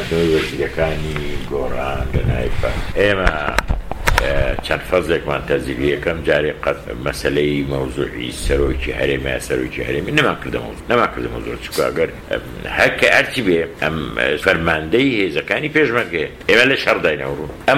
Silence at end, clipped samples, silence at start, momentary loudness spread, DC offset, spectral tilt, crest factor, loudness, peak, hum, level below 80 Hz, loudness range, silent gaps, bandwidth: 0 s; under 0.1%; 0 s; 9 LU; under 0.1%; -5 dB/octave; 18 dB; -18 LUFS; 0 dBFS; none; -28 dBFS; 4 LU; none; 16.5 kHz